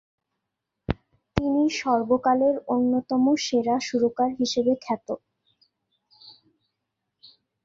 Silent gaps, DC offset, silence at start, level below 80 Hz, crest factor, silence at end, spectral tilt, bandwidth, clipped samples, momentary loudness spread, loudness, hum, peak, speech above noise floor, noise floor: none; under 0.1%; 0.9 s; -50 dBFS; 24 dB; 1.35 s; -5 dB/octave; 7.6 kHz; under 0.1%; 11 LU; -24 LUFS; none; -2 dBFS; 60 dB; -83 dBFS